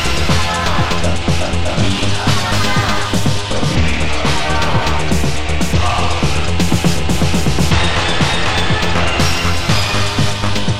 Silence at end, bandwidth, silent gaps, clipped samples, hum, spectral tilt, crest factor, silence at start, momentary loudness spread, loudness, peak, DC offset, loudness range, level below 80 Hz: 0 s; 16 kHz; none; under 0.1%; none; -4.5 dB/octave; 14 dB; 0 s; 3 LU; -15 LUFS; 0 dBFS; 10%; 1 LU; -24 dBFS